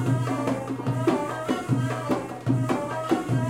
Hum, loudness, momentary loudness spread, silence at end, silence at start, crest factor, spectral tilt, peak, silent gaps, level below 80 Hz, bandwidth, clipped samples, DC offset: none; -27 LUFS; 4 LU; 0 s; 0 s; 16 dB; -7 dB/octave; -10 dBFS; none; -58 dBFS; 15.5 kHz; under 0.1%; under 0.1%